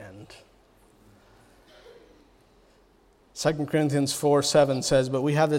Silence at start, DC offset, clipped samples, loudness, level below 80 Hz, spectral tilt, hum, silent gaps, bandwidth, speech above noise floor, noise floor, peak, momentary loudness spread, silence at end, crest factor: 0 s; under 0.1%; under 0.1%; -24 LUFS; -54 dBFS; -5 dB/octave; none; none; 16 kHz; 37 dB; -60 dBFS; -8 dBFS; 18 LU; 0 s; 20 dB